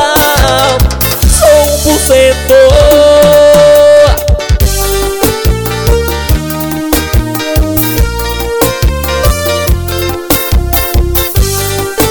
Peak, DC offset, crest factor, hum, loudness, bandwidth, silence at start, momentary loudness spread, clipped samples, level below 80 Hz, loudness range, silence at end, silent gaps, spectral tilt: 0 dBFS; under 0.1%; 8 dB; none; -8 LUFS; 20 kHz; 0 s; 9 LU; 0.3%; -14 dBFS; 6 LU; 0 s; none; -4.5 dB/octave